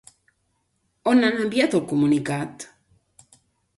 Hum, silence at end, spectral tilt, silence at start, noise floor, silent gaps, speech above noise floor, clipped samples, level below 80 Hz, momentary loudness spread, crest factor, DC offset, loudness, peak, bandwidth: none; 1.15 s; -5.5 dB/octave; 1.05 s; -71 dBFS; none; 50 dB; under 0.1%; -64 dBFS; 16 LU; 18 dB; under 0.1%; -21 LUFS; -6 dBFS; 11.5 kHz